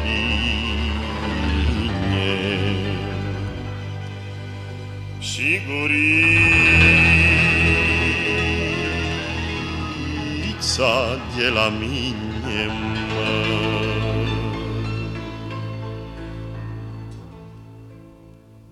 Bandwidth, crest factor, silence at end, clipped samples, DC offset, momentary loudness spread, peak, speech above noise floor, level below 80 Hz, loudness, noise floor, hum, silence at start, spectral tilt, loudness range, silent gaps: 13 kHz; 20 dB; 0.1 s; under 0.1%; under 0.1%; 20 LU; -2 dBFS; 26 dB; -32 dBFS; -19 LUFS; -46 dBFS; none; 0 s; -5 dB/octave; 14 LU; none